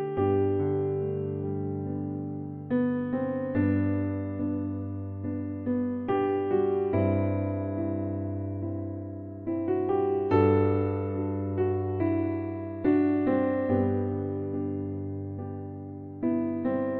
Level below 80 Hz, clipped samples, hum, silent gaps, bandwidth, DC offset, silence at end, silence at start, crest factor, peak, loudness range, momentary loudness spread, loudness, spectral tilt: -62 dBFS; under 0.1%; none; none; 4.3 kHz; under 0.1%; 0 s; 0 s; 18 dB; -10 dBFS; 3 LU; 10 LU; -29 LUFS; -12 dB/octave